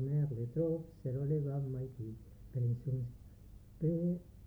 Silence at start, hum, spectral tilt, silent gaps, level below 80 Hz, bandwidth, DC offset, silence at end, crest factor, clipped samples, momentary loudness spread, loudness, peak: 0 s; 50 Hz at -60 dBFS; -11.5 dB/octave; none; -58 dBFS; 2.2 kHz; under 0.1%; 0 s; 14 dB; under 0.1%; 18 LU; -38 LUFS; -24 dBFS